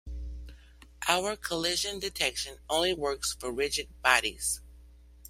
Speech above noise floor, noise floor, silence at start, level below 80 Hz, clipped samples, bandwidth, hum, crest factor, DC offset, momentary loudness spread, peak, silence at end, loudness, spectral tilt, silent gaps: 23 dB; -53 dBFS; 0.05 s; -48 dBFS; under 0.1%; 16 kHz; none; 28 dB; under 0.1%; 12 LU; -4 dBFS; 0 s; -29 LUFS; -1.5 dB/octave; none